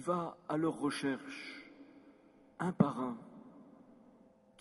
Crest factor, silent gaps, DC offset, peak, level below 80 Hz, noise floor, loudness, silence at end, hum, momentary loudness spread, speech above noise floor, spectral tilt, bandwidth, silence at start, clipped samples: 26 dB; none; under 0.1%; -14 dBFS; -78 dBFS; -64 dBFS; -37 LUFS; 0.85 s; none; 25 LU; 28 dB; -6.5 dB/octave; 11.5 kHz; 0 s; under 0.1%